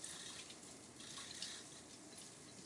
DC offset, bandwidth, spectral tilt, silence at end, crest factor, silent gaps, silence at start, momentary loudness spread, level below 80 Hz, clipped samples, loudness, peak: under 0.1%; 12 kHz; -1 dB/octave; 0 s; 22 dB; none; 0 s; 8 LU; -84 dBFS; under 0.1%; -51 LUFS; -32 dBFS